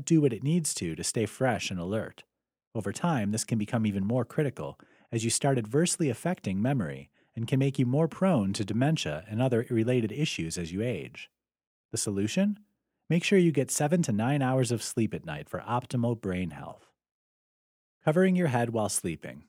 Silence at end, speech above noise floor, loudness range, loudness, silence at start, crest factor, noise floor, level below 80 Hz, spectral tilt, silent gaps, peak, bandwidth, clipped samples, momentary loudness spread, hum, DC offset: 0.1 s; over 62 dB; 4 LU; -29 LUFS; 0 s; 16 dB; under -90 dBFS; -64 dBFS; -5.5 dB/octave; 2.67-2.71 s, 11.67-11.89 s, 17.11-18.01 s; -12 dBFS; 16 kHz; under 0.1%; 12 LU; none; under 0.1%